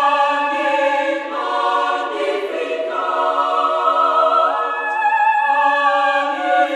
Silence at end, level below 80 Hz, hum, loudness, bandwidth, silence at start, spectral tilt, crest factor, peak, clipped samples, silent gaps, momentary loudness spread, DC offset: 0 s; -76 dBFS; none; -17 LUFS; 10.5 kHz; 0 s; -1 dB/octave; 14 dB; -4 dBFS; under 0.1%; none; 6 LU; under 0.1%